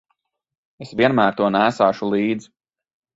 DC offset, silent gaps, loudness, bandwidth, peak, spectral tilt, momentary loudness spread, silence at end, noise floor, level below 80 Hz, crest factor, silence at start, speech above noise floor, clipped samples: under 0.1%; none; -19 LUFS; 8 kHz; -2 dBFS; -6.5 dB/octave; 9 LU; 0.75 s; -73 dBFS; -60 dBFS; 20 dB; 0.8 s; 54 dB; under 0.1%